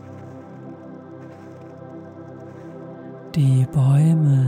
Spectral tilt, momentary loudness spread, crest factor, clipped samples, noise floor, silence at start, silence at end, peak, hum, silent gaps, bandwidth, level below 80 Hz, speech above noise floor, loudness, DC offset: -9 dB/octave; 23 LU; 12 dB; under 0.1%; -39 dBFS; 0.05 s; 0 s; -10 dBFS; none; none; 10 kHz; -58 dBFS; 24 dB; -18 LUFS; under 0.1%